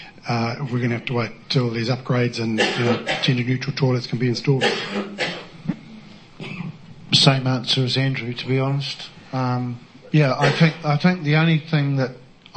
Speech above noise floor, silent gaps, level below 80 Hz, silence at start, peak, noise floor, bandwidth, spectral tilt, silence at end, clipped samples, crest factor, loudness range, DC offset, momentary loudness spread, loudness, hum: 22 dB; none; -56 dBFS; 0 s; 0 dBFS; -42 dBFS; 8.8 kHz; -5.5 dB/octave; 0.3 s; under 0.1%; 20 dB; 3 LU; under 0.1%; 13 LU; -21 LUFS; none